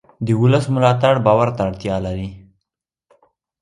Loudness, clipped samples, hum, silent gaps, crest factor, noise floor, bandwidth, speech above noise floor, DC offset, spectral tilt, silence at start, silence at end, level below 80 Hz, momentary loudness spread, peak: -17 LUFS; under 0.1%; none; none; 18 dB; -82 dBFS; 11 kHz; 66 dB; under 0.1%; -7.5 dB/octave; 0.2 s; 1.2 s; -44 dBFS; 11 LU; 0 dBFS